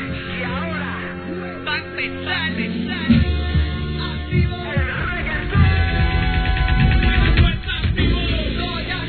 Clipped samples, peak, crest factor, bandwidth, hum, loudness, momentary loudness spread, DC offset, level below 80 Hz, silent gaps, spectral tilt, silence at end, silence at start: under 0.1%; -2 dBFS; 16 dB; 4.5 kHz; none; -20 LUFS; 9 LU; 0.2%; -24 dBFS; none; -9.5 dB/octave; 0 s; 0 s